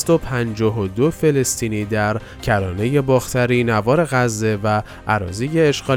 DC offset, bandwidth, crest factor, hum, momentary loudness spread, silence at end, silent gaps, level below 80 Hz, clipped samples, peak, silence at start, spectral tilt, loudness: under 0.1%; 17.5 kHz; 14 dB; none; 5 LU; 0 s; none; -40 dBFS; under 0.1%; -4 dBFS; 0 s; -5.5 dB/octave; -19 LUFS